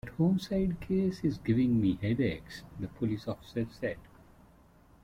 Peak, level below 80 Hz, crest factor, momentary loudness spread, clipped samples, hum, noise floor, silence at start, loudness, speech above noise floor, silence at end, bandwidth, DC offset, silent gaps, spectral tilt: -18 dBFS; -52 dBFS; 14 dB; 14 LU; under 0.1%; none; -60 dBFS; 0.05 s; -32 LUFS; 29 dB; 1 s; 14.5 kHz; under 0.1%; none; -8 dB/octave